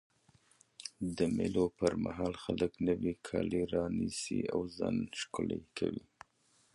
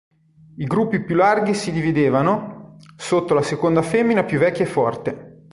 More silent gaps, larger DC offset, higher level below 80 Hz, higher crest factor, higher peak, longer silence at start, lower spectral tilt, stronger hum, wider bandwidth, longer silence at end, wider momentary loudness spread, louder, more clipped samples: neither; neither; about the same, -58 dBFS vs -54 dBFS; about the same, 20 dB vs 16 dB; second, -16 dBFS vs -4 dBFS; first, 0.8 s vs 0.55 s; about the same, -5.5 dB/octave vs -6.5 dB/octave; neither; about the same, 11.5 kHz vs 11.5 kHz; first, 0.75 s vs 0.25 s; second, 7 LU vs 12 LU; second, -36 LUFS vs -19 LUFS; neither